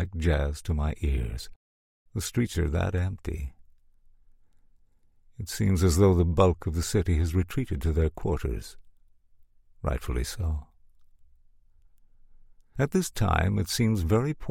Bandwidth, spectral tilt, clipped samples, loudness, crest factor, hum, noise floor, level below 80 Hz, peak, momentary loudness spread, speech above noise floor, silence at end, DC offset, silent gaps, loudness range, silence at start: 16.5 kHz; -6 dB/octave; under 0.1%; -27 LUFS; 22 dB; none; -60 dBFS; -38 dBFS; -6 dBFS; 14 LU; 35 dB; 0 s; under 0.1%; 1.56-2.06 s; 11 LU; 0 s